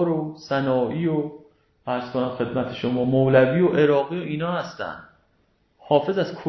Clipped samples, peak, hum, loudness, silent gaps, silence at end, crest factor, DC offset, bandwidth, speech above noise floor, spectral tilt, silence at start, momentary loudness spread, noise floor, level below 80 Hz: under 0.1%; -6 dBFS; none; -22 LUFS; none; 0 s; 18 dB; under 0.1%; 6.2 kHz; 43 dB; -8 dB/octave; 0 s; 14 LU; -65 dBFS; -58 dBFS